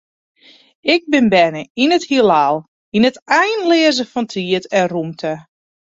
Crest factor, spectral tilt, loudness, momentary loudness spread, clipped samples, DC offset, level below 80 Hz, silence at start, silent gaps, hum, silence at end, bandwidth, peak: 16 dB; -4.5 dB/octave; -15 LUFS; 10 LU; under 0.1%; under 0.1%; -58 dBFS; 0.85 s; 1.70-1.75 s, 2.68-2.92 s, 3.22-3.26 s; none; 0.55 s; 7.8 kHz; -2 dBFS